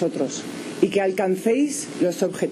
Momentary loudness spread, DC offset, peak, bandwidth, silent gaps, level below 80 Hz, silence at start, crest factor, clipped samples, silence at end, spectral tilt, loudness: 7 LU; under 0.1%; -6 dBFS; 13.5 kHz; none; -68 dBFS; 0 s; 16 dB; under 0.1%; 0 s; -5 dB/octave; -23 LUFS